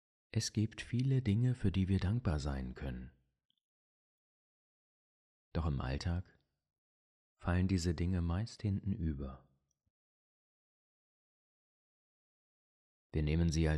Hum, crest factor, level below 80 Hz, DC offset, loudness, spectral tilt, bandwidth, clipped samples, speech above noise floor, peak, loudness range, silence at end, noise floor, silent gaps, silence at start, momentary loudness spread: none; 18 dB; -48 dBFS; under 0.1%; -37 LUFS; -6.5 dB/octave; 11.5 kHz; under 0.1%; over 55 dB; -20 dBFS; 11 LU; 0 s; under -90 dBFS; 3.45-3.49 s, 3.63-5.51 s, 6.78-7.36 s, 9.90-13.10 s; 0.35 s; 11 LU